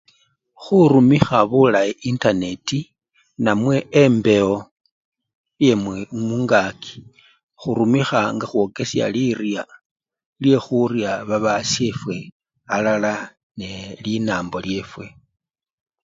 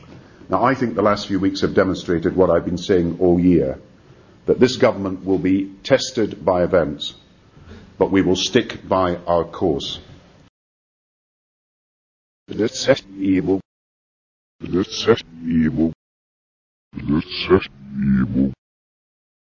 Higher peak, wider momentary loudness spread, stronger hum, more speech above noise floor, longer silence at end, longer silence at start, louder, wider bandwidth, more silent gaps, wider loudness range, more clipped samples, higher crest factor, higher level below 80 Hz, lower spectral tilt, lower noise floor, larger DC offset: about the same, 0 dBFS vs 0 dBFS; first, 15 LU vs 8 LU; neither; first, 41 dB vs 30 dB; about the same, 0.95 s vs 0.9 s; first, 0.6 s vs 0.1 s; about the same, -19 LUFS vs -19 LUFS; about the same, 7.8 kHz vs 7.4 kHz; second, 4.71-4.76 s, 4.91-5.12 s, 5.35-5.44 s, 7.43-7.48 s, 9.86-9.96 s, 10.26-10.33 s, 12.32-12.40 s, 13.43-13.55 s vs 10.49-12.46 s, 13.65-14.59 s, 15.95-16.91 s; about the same, 6 LU vs 6 LU; neither; about the same, 20 dB vs 20 dB; second, -52 dBFS vs -42 dBFS; about the same, -6 dB/octave vs -6 dB/octave; first, -60 dBFS vs -48 dBFS; neither